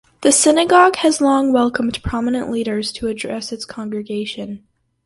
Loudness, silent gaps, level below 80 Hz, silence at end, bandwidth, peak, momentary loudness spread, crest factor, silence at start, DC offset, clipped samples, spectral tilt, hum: -17 LUFS; none; -42 dBFS; 0.5 s; 11.5 kHz; 0 dBFS; 15 LU; 18 dB; 0.2 s; under 0.1%; under 0.1%; -3 dB/octave; none